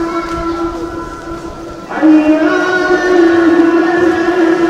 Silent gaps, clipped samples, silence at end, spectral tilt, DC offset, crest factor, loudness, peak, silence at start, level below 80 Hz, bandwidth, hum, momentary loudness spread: none; under 0.1%; 0 s; -5.5 dB/octave; 0.1%; 12 dB; -11 LUFS; 0 dBFS; 0 s; -36 dBFS; 9 kHz; none; 16 LU